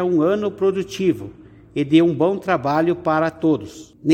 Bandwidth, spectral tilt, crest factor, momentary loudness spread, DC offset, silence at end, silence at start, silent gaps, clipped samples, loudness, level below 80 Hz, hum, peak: 9.2 kHz; -7 dB/octave; 16 dB; 12 LU; under 0.1%; 0 s; 0 s; none; under 0.1%; -19 LUFS; -56 dBFS; none; -4 dBFS